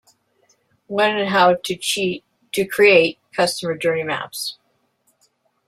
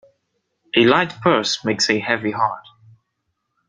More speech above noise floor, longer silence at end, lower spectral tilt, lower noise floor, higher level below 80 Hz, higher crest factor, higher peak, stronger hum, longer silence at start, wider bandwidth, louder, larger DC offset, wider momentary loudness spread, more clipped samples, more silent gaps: second, 47 dB vs 56 dB; about the same, 1.15 s vs 1.1 s; about the same, -3.5 dB/octave vs -4 dB/octave; second, -65 dBFS vs -74 dBFS; about the same, -64 dBFS vs -60 dBFS; about the same, 20 dB vs 20 dB; about the same, -2 dBFS vs 0 dBFS; neither; first, 0.9 s vs 0.75 s; first, 15.5 kHz vs 9.4 kHz; about the same, -19 LUFS vs -18 LUFS; neither; first, 14 LU vs 7 LU; neither; neither